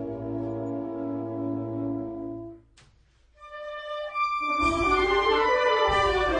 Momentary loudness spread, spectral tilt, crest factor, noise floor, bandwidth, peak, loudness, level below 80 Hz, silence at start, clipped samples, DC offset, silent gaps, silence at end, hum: 15 LU; -5 dB/octave; 16 dB; -60 dBFS; 10 kHz; -12 dBFS; -26 LUFS; -44 dBFS; 0 s; under 0.1%; under 0.1%; none; 0 s; none